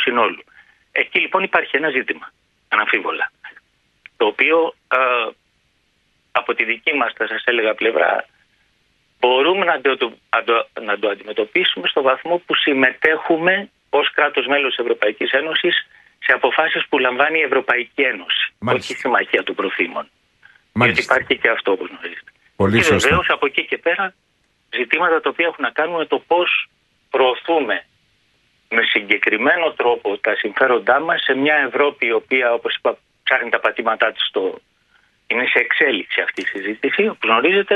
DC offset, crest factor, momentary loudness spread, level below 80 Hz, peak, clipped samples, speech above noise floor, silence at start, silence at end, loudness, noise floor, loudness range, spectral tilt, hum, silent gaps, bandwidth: under 0.1%; 18 dB; 8 LU; -54 dBFS; 0 dBFS; under 0.1%; 45 dB; 0 s; 0 s; -17 LUFS; -63 dBFS; 3 LU; -4 dB/octave; none; none; 12 kHz